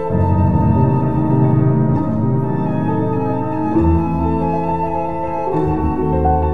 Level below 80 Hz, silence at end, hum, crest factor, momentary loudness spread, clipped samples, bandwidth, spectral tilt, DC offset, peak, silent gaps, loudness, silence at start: -28 dBFS; 0 s; none; 14 dB; 5 LU; under 0.1%; 4.5 kHz; -11.5 dB/octave; 4%; -2 dBFS; none; -17 LUFS; 0 s